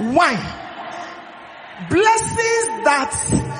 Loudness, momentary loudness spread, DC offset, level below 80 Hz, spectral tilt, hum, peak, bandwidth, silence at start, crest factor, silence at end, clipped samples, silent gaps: -17 LUFS; 21 LU; under 0.1%; -44 dBFS; -3.5 dB/octave; none; -2 dBFS; 10 kHz; 0 s; 18 dB; 0 s; under 0.1%; none